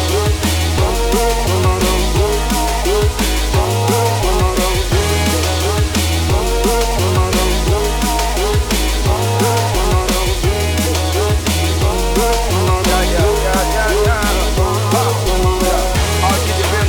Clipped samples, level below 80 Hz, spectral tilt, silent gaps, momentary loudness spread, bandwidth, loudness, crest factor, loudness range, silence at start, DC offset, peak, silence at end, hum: under 0.1%; -20 dBFS; -4.5 dB/octave; none; 2 LU; over 20 kHz; -15 LUFS; 14 dB; 1 LU; 0 s; under 0.1%; 0 dBFS; 0 s; none